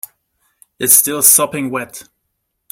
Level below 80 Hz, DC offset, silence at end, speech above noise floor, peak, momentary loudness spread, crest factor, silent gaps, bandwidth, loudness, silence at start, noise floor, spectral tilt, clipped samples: -60 dBFS; under 0.1%; 0.7 s; 58 dB; 0 dBFS; 20 LU; 16 dB; none; over 20 kHz; -10 LUFS; 0.8 s; -71 dBFS; -1.5 dB/octave; 0.2%